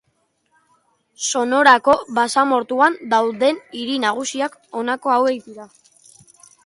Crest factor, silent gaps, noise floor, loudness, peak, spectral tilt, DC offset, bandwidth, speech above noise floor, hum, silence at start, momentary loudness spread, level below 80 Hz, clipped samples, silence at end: 18 dB; none; -67 dBFS; -18 LUFS; 0 dBFS; -2 dB/octave; under 0.1%; 11.5 kHz; 49 dB; none; 1.2 s; 12 LU; -64 dBFS; under 0.1%; 1 s